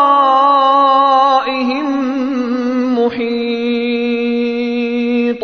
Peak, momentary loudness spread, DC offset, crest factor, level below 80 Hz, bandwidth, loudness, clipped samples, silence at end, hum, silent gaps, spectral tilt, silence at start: 0 dBFS; 7 LU; under 0.1%; 12 dB; -54 dBFS; 6.6 kHz; -14 LUFS; under 0.1%; 0 s; none; none; -5.5 dB/octave; 0 s